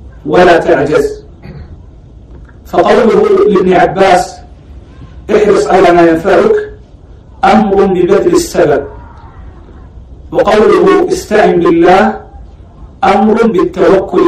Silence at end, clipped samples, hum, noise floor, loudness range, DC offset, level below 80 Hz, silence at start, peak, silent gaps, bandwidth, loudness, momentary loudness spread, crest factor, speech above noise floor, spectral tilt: 0 s; 1%; none; -34 dBFS; 3 LU; under 0.1%; -32 dBFS; 0.05 s; 0 dBFS; none; 14.5 kHz; -8 LUFS; 9 LU; 10 dB; 27 dB; -6 dB/octave